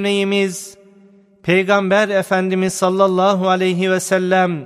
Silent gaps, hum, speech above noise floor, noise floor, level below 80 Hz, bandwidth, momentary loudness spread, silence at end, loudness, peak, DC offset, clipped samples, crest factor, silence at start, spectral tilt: none; none; 33 dB; -48 dBFS; -64 dBFS; 14.5 kHz; 5 LU; 0 s; -16 LUFS; 0 dBFS; under 0.1%; under 0.1%; 16 dB; 0 s; -5 dB/octave